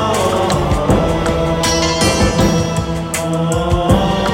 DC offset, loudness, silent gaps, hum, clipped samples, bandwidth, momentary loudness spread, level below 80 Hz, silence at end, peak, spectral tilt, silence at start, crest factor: under 0.1%; -15 LUFS; none; none; under 0.1%; 17 kHz; 5 LU; -26 dBFS; 0 s; 0 dBFS; -5 dB/octave; 0 s; 14 dB